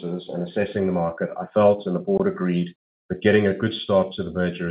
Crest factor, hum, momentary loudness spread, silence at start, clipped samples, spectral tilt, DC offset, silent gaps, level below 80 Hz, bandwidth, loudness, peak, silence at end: 18 dB; none; 10 LU; 0 s; under 0.1%; -5.5 dB/octave; under 0.1%; 2.75-3.09 s; -56 dBFS; 5 kHz; -23 LUFS; -4 dBFS; 0 s